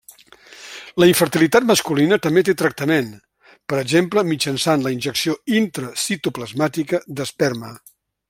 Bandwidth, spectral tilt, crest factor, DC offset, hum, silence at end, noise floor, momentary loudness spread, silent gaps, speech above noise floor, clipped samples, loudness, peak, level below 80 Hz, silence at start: 16.5 kHz; -4.5 dB/octave; 18 dB; under 0.1%; none; 0.5 s; -46 dBFS; 13 LU; none; 28 dB; under 0.1%; -19 LUFS; -2 dBFS; -58 dBFS; 0.5 s